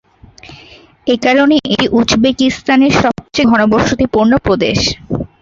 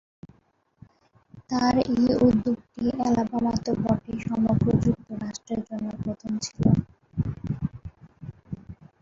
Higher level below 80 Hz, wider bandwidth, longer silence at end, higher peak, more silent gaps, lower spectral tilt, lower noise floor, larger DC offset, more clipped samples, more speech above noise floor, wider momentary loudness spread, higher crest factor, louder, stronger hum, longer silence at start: first, -36 dBFS vs -46 dBFS; about the same, 7.8 kHz vs 7.6 kHz; about the same, 0.15 s vs 0.25 s; first, 0 dBFS vs -6 dBFS; neither; second, -5 dB/octave vs -7 dB/octave; second, -40 dBFS vs -65 dBFS; neither; neither; second, 29 dB vs 41 dB; second, 6 LU vs 18 LU; second, 12 dB vs 20 dB; first, -12 LUFS vs -25 LUFS; neither; second, 0.45 s vs 1.35 s